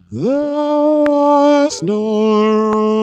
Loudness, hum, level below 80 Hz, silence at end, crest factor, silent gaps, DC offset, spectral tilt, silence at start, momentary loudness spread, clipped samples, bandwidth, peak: -14 LUFS; none; -56 dBFS; 0 s; 12 dB; none; under 0.1%; -6 dB/octave; 0.1 s; 6 LU; under 0.1%; 9 kHz; 0 dBFS